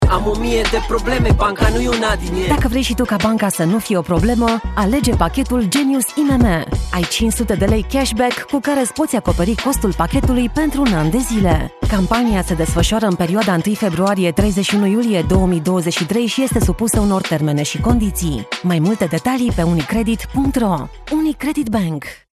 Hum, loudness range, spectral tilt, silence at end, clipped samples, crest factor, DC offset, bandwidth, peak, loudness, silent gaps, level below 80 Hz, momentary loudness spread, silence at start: none; 1 LU; -5.5 dB/octave; 0.15 s; under 0.1%; 14 dB; under 0.1%; 14 kHz; -2 dBFS; -17 LUFS; none; -26 dBFS; 3 LU; 0 s